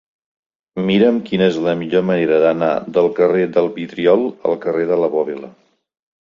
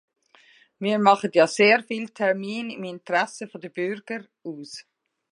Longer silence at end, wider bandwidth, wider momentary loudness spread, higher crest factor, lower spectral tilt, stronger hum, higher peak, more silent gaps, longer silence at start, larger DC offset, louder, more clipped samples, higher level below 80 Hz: first, 0.7 s vs 0.5 s; second, 7.2 kHz vs 11.5 kHz; second, 7 LU vs 19 LU; second, 16 dB vs 22 dB; first, -7.5 dB/octave vs -4.5 dB/octave; neither; about the same, -2 dBFS vs -2 dBFS; neither; about the same, 0.75 s vs 0.8 s; neither; first, -16 LUFS vs -23 LUFS; neither; first, -58 dBFS vs -80 dBFS